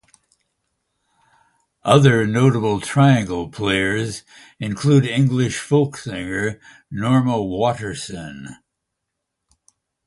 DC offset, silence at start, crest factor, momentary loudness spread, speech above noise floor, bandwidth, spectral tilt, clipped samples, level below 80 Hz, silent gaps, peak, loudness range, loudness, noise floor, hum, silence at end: under 0.1%; 1.85 s; 20 dB; 16 LU; 61 dB; 11.5 kHz; -6 dB/octave; under 0.1%; -50 dBFS; none; 0 dBFS; 6 LU; -19 LUFS; -79 dBFS; none; 1.55 s